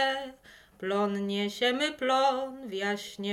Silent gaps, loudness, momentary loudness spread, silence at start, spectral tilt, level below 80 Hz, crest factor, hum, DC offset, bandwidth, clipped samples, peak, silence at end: none; -29 LUFS; 10 LU; 0 s; -4 dB/octave; -70 dBFS; 16 dB; none; under 0.1%; 16 kHz; under 0.1%; -14 dBFS; 0 s